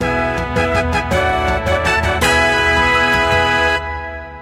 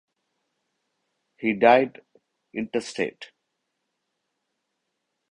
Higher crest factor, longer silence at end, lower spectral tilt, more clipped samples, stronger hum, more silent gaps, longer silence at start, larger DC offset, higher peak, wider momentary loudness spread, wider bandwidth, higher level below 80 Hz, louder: second, 14 dB vs 24 dB; second, 0 s vs 2.05 s; about the same, -4.5 dB/octave vs -5 dB/octave; neither; neither; neither; second, 0 s vs 1.4 s; neither; about the same, -2 dBFS vs -4 dBFS; second, 6 LU vs 14 LU; first, 16 kHz vs 10.5 kHz; first, -28 dBFS vs -70 dBFS; first, -14 LUFS vs -23 LUFS